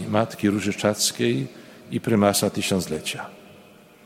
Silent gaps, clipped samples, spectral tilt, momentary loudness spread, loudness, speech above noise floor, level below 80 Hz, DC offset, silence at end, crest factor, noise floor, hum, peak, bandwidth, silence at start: none; under 0.1%; -4 dB/octave; 12 LU; -23 LUFS; 27 dB; -60 dBFS; under 0.1%; 0.45 s; 20 dB; -50 dBFS; none; -4 dBFS; 16.5 kHz; 0 s